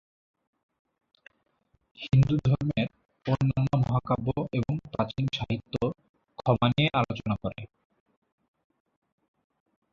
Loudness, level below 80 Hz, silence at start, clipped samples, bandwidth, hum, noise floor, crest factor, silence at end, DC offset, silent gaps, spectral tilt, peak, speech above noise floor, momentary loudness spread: -28 LUFS; -52 dBFS; 2 s; under 0.1%; 7 kHz; none; -71 dBFS; 22 dB; 2.25 s; under 0.1%; 6.09-6.14 s; -8 dB/octave; -8 dBFS; 45 dB; 11 LU